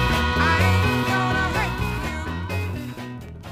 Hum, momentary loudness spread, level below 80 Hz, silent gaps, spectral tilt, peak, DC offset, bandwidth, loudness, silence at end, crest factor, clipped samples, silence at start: none; 15 LU; -32 dBFS; none; -5.5 dB/octave; -6 dBFS; under 0.1%; 15.5 kHz; -22 LUFS; 0 s; 16 dB; under 0.1%; 0 s